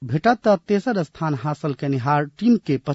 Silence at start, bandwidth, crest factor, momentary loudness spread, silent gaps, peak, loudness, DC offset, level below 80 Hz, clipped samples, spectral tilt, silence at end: 0 s; 8 kHz; 16 dB; 6 LU; none; -4 dBFS; -21 LUFS; under 0.1%; -58 dBFS; under 0.1%; -8 dB/octave; 0 s